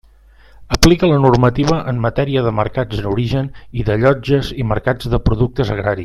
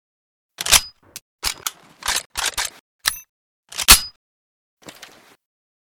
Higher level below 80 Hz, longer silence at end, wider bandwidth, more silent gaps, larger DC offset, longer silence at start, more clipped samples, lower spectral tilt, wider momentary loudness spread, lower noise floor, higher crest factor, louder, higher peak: first, -28 dBFS vs -38 dBFS; second, 0 s vs 1.75 s; second, 14 kHz vs over 20 kHz; second, none vs 1.22-1.39 s, 2.26-2.30 s, 2.80-2.99 s, 3.29-3.63 s; neither; about the same, 0.6 s vs 0.6 s; second, under 0.1% vs 0.1%; first, -6 dB/octave vs 0.5 dB/octave; second, 8 LU vs 20 LU; about the same, -45 dBFS vs -46 dBFS; second, 16 dB vs 24 dB; about the same, -16 LUFS vs -18 LUFS; about the same, 0 dBFS vs 0 dBFS